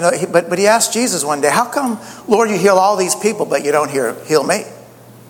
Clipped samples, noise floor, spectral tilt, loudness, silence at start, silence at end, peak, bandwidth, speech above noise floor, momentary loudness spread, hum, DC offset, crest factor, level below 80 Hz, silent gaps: under 0.1%; -40 dBFS; -3.5 dB/octave; -15 LUFS; 0 s; 0.5 s; 0 dBFS; 19.5 kHz; 25 dB; 8 LU; none; under 0.1%; 16 dB; -62 dBFS; none